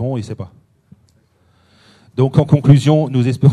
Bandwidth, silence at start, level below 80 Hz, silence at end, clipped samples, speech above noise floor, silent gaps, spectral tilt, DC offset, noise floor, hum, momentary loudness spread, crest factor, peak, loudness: 10.5 kHz; 0 s; -48 dBFS; 0 s; 0.1%; 43 dB; none; -8.5 dB/octave; under 0.1%; -56 dBFS; none; 19 LU; 16 dB; 0 dBFS; -14 LUFS